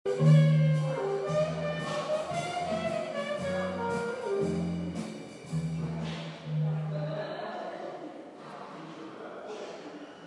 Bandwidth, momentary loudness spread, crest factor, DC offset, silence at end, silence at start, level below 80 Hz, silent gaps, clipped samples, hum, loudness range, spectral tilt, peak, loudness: 11 kHz; 18 LU; 18 dB; under 0.1%; 0 s; 0.05 s; -66 dBFS; none; under 0.1%; none; 8 LU; -7.5 dB/octave; -12 dBFS; -31 LUFS